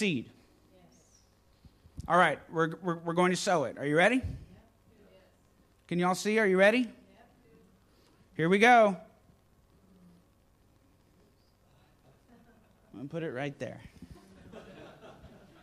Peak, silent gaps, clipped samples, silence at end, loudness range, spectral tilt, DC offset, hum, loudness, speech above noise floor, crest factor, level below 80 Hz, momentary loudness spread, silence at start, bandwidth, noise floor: -10 dBFS; none; under 0.1%; 0.35 s; 16 LU; -5 dB/octave; under 0.1%; 50 Hz at -60 dBFS; -27 LUFS; 38 dB; 22 dB; -60 dBFS; 26 LU; 0 s; 14.5 kHz; -65 dBFS